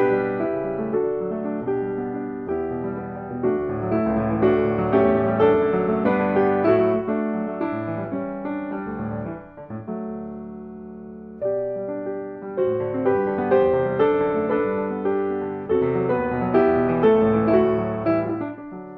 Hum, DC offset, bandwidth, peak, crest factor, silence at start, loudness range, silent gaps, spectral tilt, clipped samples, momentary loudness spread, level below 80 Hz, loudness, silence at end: none; under 0.1%; 4.6 kHz; -4 dBFS; 18 dB; 0 s; 11 LU; none; -10.5 dB/octave; under 0.1%; 13 LU; -50 dBFS; -22 LUFS; 0 s